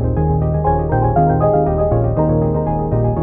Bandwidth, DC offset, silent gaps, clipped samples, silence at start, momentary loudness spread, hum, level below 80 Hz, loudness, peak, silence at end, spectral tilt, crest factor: 2.6 kHz; under 0.1%; none; under 0.1%; 0 s; 3 LU; none; -24 dBFS; -16 LUFS; -2 dBFS; 0 s; -15 dB/octave; 12 dB